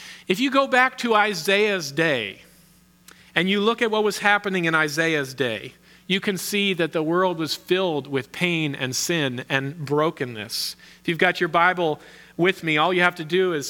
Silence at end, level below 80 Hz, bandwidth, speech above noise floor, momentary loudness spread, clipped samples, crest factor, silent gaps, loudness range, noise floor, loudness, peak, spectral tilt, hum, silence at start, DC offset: 0 s; -66 dBFS; 18 kHz; 33 dB; 8 LU; under 0.1%; 20 dB; none; 2 LU; -55 dBFS; -22 LUFS; -2 dBFS; -4 dB/octave; none; 0 s; under 0.1%